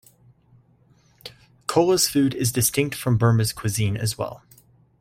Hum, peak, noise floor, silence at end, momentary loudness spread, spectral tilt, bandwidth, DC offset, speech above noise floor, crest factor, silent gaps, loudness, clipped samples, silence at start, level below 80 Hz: none; -4 dBFS; -58 dBFS; 0.65 s; 21 LU; -4.5 dB/octave; 16.5 kHz; under 0.1%; 37 dB; 20 dB; none; -22 LUFS; under 0.1%; 1.25 s; -52 dBFS